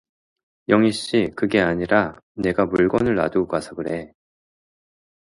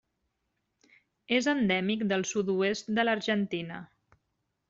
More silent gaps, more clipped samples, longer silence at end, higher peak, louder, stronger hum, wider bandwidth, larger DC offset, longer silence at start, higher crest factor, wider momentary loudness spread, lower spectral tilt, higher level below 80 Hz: first, 2.23-2.35 s vs none; neither; first, 1.3 s vs 0.85 s; first, -2 dBFS vs -12 dBFS; first, -21 LUFS vs -29 LUFS; neither; first, 11.5 kHz vs 7.8 kHz; neither; second, 0.7 s vs 1.3 s; about the same, 20 dB vs 20 dB; about the same, 10 LU vs 8 LU; first, -6 dB/octave vs -4.5 dB/octave; first, -50 dBFS vs -70 dBFS